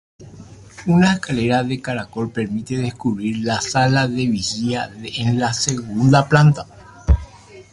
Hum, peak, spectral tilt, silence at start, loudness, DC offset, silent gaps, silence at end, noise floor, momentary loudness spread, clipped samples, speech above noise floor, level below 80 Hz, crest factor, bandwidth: none; -2 dBFS; -5.5 dB/octave; 0.2 s; -19 LUFS; under 0.1%; none; 0.1 s; -40 dBFS; 11 LU; under 0.1%; 22 dB; -30 dBFS; 18 dB; 11.5 kHz